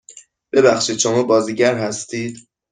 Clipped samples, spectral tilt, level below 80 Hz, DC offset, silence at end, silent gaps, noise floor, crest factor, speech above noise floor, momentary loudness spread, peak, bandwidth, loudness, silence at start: under 0.1%; -3.5 dB/octave; -62 dBFS; under 0.1%; 0.3 s; none; -45 dBFS; 16 dB; 28 dB; 11 LU; -2 dBFS; 10 kHz; -17 LUFS; 0.1 s